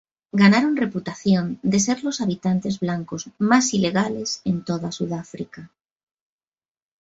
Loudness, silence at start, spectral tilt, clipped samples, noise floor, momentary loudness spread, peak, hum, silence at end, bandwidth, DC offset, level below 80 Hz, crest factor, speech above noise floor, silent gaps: -21 LUFS; 0.35 s; -5 dB/octave; under 0.1%; under -90 dBFS; 12 LU; -4 dBFS; none; 1.35 s; 8 kHz; under 0.1%; -60 dBFS; 20 dB; over 69 dB; none